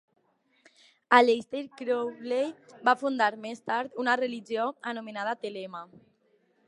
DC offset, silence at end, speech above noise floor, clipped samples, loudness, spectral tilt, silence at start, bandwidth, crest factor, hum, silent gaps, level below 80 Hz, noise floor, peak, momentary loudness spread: under 0.1%; 0.8 s; 40 dB; under 0.1%; -28 LUFS; -4 dB/octave; 1.1 s; 11 kHz; 26 dB; none; none; -82 dBFS; -69 dBFS; -4 dBFS; 15 LU